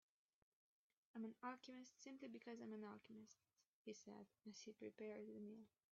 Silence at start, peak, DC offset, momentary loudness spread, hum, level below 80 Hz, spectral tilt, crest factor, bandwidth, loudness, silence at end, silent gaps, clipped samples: 1.15 s; -40 dBFS; under 0.1%; 8 LU; none; under -90 dBFS; -4.5 dB/octave; 20 dB; 7.4 kHz; -58 LUFS; 0.25 s; 3.68-3.85 s; under 0.1%